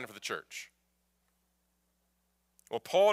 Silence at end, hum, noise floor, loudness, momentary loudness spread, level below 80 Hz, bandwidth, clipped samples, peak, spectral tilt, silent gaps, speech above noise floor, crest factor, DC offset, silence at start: 0 s; none; -77 dBFS; -35 LUFS; 16 LU; -82 dBFS; 16 kHz; under 0.1%; -16 dBFS; -2.5 dB/octave; none; 46 dB; 20 dB; under 0.1%; 0 s